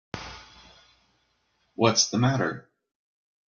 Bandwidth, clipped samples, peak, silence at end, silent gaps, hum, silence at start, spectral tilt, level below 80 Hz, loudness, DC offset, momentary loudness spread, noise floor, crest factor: 7.4 kHz; under 0.1%; -6 dBFS; 0.9 s; none; none; 0.15 s; -4 dB/octave; -60 dBFS; -24 LUFS; under 0.1%; 22 LU; -71 dBFS; 24 dB